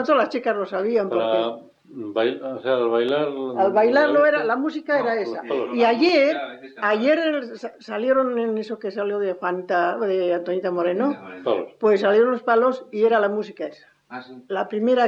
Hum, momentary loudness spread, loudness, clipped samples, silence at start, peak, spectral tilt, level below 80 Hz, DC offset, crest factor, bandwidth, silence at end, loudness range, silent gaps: none; 12 LU; -21 LUFS; under 0.1%; 0 s; -6 dBFS; -6 dB/octave; -74 dBFS; under 0.1%; 14 dB; 7.4 kHz; 0 s; 3 LU; none